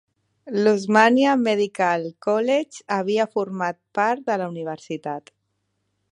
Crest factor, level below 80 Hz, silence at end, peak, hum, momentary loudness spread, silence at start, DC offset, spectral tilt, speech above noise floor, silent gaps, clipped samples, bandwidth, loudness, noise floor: 22 dB; -74 dBFS; 0.9 s; -2 dBFS; none; 14 LU; 0.45 s; under 0.1%; -5.5 dB/octave; 52 dB; none; under 0.1%; 10.5 kHz; -22 LUFS; -74 dBFS